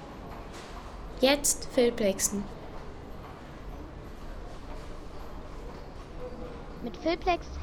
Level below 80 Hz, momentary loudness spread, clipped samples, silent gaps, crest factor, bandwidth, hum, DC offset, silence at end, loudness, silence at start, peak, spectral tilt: -44 dBFS; 19 LU; under 0.1%; none; 24 dB; 18 kHz; none; under 0.1%; 0 s; -28 LUFS; 0 s; -10 dBFS; -3 dB/octave